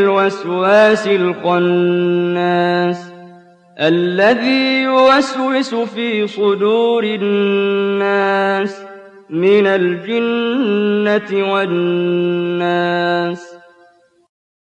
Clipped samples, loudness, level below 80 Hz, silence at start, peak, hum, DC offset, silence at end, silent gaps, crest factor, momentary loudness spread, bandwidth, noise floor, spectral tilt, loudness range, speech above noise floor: under 0.1%; -15 LUFS; -64 dBFS; 0 s; -2 dBFS; none; under 0.1%; 1.05 s; none; 12 dB; 7 LU; 9 kHz; -51 dBFS; -6 dB/octave; 2 LU; 36 dB